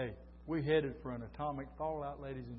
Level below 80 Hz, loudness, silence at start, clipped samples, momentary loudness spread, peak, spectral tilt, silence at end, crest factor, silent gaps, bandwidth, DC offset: -56 dBFS; -39 LUFS; 0 s; under 0.1%; 11 LU; -20 dBFS; -5.5 dB/octave; 0 s; 20 dB; none; 5.6 kHz; under 0.1%